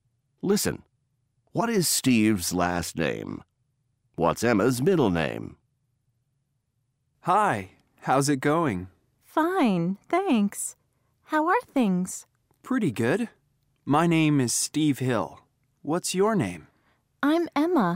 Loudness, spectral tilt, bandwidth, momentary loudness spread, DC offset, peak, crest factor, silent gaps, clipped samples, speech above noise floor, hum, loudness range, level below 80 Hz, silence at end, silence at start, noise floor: -25 LUFS; -5 dB/octave; 16 kHz; 14 LU; under 0.1%; -8 dBFS; 18 dB; none; under 0.1%; 51 dB; none; 2 LU; -58 dBFS; 0 s; 0.45 s; -75 dBFS